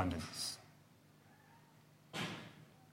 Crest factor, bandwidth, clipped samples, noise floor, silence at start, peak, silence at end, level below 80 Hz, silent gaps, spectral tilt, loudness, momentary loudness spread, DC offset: 24 dB; 16.5 kHz; under 0.1%; -66 dBFS; 0 s; -22 dBFS; 0 s; -70 dBFS; none; -3.5 dB/octave; -44 LUFS; 24 LU; under 0.1%